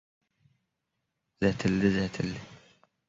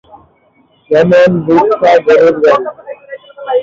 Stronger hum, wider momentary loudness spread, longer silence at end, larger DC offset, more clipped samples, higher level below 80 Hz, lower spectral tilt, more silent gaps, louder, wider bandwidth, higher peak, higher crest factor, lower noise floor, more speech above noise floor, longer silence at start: neither; second, 9 LU vs 21 LU; first, 0.5 s vs 0 s; neither; neither; about the same, -54 dBFS vs -50 dBFS; about the same, -6.5 dB/octave vs -7 dB/octave; neither; second, -29 LUFS vs -9 LUFS; about the same, 7.8 kHz vs 7.4 kHz; second, -12 dBFS vs 0 dBFS; first, 20 dB vs 10 dB; first, -83 dBFS vs -51 dBFS; first, 55 dB vs 43 dB; first, 1.4 s vs 0.9 s